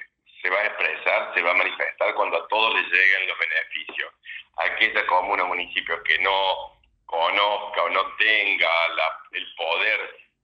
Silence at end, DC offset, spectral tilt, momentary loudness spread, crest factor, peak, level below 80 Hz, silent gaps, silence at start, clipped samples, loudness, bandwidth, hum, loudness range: 0.3 s; under 0.1%; -2 dB/octave; 12 LU; 20 dB; -4 dBFS; -66 dBFS; none; 0 s; under 0.1%; -22 LUFS; 7.2 kHz; none; 2 LU